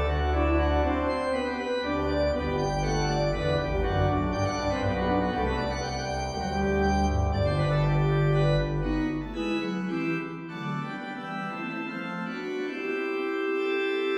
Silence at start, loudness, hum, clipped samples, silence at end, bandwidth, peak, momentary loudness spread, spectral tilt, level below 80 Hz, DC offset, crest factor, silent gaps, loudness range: 0 s; -28 LUFS; none; under 0.1%; 0 s; 10 kHz; -12 dBFS; 8 LU; -6.5 dB/octave; -36 dBFS; under 0.1%; 14 dB; none; 6 LU